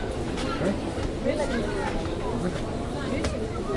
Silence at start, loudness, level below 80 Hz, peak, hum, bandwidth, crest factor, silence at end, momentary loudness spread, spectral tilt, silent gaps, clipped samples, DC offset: 0 s; -29 LUFS; -36 dBFS; -12 dBFS; none; 11.5 kHz; 16 dB; 0 s; 4 LU; -6 dB/octave; none; under 0.1%; under 0.1%